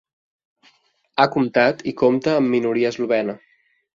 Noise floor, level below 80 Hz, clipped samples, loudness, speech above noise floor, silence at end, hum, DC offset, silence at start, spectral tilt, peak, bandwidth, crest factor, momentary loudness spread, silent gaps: -60 dBFS; -62 dBFS; under 0.1%; -19 LUFS; 42 dB; 0.6 s; none; under 0.1%; 1.15 s; -6.5 dB/octave; -2 dBFS; 7.4 kHz; 20 dB; 8 LU; none